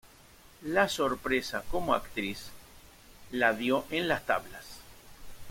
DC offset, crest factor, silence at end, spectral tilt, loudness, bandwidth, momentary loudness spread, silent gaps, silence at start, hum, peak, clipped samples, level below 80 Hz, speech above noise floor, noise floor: under 0.1%; 24 dB; 0 s; -4 dB/octave; -30 LUFS; 16.5 kHz; 19 LU; none; 0.05 s; none; -10 dBFS; under 0.1%; -52 dBFS; 26 dB; -56 dBFS